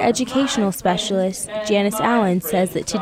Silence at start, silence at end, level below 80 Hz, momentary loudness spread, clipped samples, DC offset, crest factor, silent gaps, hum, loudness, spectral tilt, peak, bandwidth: 0 s; 0 s; -50 dBFS; 4 LU; under 0.1%; under 0.1%; 14 dB; none; none; -19 LUFS; -4.5 dB/octave; -4 dBFS; 16.5 kHz